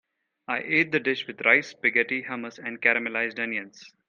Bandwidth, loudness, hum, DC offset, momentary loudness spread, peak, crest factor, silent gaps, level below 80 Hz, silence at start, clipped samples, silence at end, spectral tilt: 7.4 kHz; -24 LUFS; none; under 0.1%; 13 LU; -4 dBFS; 22 dB; none; -76 dBFS; 0.5 s; under 0.1%; 0.2 s; -4.5 dB/octave